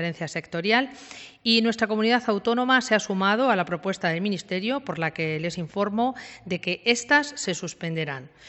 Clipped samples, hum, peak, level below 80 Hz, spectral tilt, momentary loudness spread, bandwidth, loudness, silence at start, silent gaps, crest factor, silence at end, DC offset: under 0.1%; none; -6 dBFS; -66 dBFS; -4 dB/octave; 10 LU; 8.4 kHz; -24 LUFS; 0 s; none; 20 dB; 0 s; under 0.1%